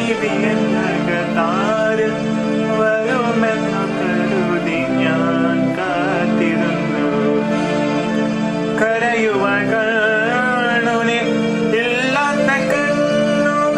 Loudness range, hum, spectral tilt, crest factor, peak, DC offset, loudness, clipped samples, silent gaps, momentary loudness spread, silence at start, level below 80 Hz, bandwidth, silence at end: 1 LU; none; -5.5 dB/octave; 14 dB; -2 dBFS; under 0.1%; -17 LUFS; under 0.1%; none; 3 LU; 0 s; -50 dBFS; 10.5 kHz; 0 s